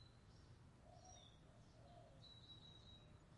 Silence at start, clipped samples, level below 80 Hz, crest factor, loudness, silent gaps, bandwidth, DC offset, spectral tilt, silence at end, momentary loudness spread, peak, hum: 0 s; under 0.1%; -74 dBFS; 14 dB; -64 LUFS; none; 10.5 kHz; under 0.1%; -4.5 dB/octave; 0 s; 6 LU; -52 dBFS; none